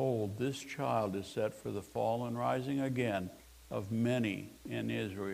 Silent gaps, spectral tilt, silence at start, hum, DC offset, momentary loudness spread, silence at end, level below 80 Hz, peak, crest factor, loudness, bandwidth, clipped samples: none; -6.5 dB/octave; 0 s; none; under 0.1%; 9 LU; 0 s; -66 dBFS; -20 dBFS; 16 dB; -36 LUFS; 15.5 kHz; under 0.1%